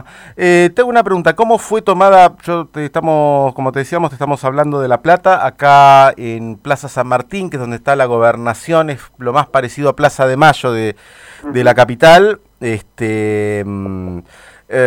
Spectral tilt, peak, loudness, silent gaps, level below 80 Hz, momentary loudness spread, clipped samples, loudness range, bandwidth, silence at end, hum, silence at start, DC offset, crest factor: -5.5 dB/octave; 0 dBFS; -12 LUFS; none; -46 dBFS; 15 LU; 0.4%; 4 LU; 16 kHz; 0 s; none; 0.25 s; under 0.1%; 12 dB